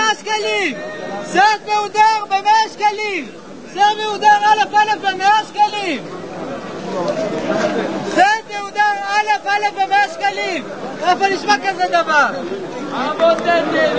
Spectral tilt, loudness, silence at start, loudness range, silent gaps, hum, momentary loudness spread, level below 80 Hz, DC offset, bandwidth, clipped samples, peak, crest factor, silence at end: -3 dB/octave; -16 LUFS; 0 s; 3 LU; none; none; 12 LU; -60 dBFS; 0.6%; 8 kHz; under 0.1%; 0 dBFS; 16 dB; 0 s